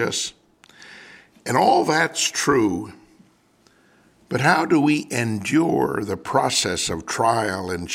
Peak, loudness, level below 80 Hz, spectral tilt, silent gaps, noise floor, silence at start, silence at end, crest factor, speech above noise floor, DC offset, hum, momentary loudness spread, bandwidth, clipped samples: -2 dBFS; -21 LUFS; -56 dBFS; -4 dB/octave; none; -58 dBFS; 0 s; 0 s; 20 dB; 38 dB; under 0.1%; none; 10 LU; 16.5 kHz; under 0.1%